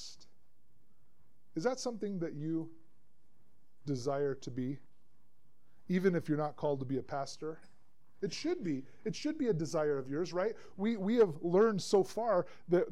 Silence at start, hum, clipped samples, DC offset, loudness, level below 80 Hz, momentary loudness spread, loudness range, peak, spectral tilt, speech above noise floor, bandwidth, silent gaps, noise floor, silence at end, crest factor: 0 s; none; under 0.1%; 0.4%; -35 LUFS; -72 dBFS; 12 LU; 9 LU; -16 dBFS; -6 dB/octave; 41 dB; 13 kHz; none; -75 dBFS; 0 s; 18 dB